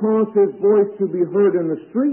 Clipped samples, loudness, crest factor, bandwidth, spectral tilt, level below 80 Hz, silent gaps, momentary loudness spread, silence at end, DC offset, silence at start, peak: under 0.1%; -18 LUFS; 12 dB; 3 kHz; -13.5 dB/octave; -72 dBFS; none; 5 LU; 0 s; under 0.1%; 0 s; -6 dBFS